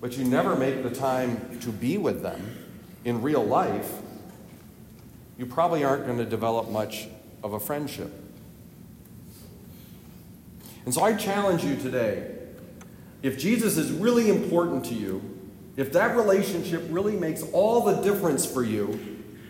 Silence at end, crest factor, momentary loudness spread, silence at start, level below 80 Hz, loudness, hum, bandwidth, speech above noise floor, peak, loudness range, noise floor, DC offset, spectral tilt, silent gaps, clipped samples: 0 s; 18 dB; 24 LU; 0 s; -60 dBFS; -26 LUFS; none; 16.5 kHz; 22 dB; -10 dBFS; 8 LU; -47 dBFS; under 0.1%; -5.5 dB/octave; none; under 0.1%